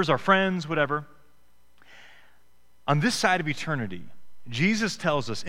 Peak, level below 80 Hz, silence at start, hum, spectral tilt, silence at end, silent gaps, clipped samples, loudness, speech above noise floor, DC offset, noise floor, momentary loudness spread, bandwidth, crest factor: -4 dBFS; -56 dBFS; 0 s; none; -5 dB/octave; 0 s; none; under 0.1%; -25 LUFS; 41 dB; under 0.1%; -66 dBFS; 13 LU; 16 kHz; 22 dB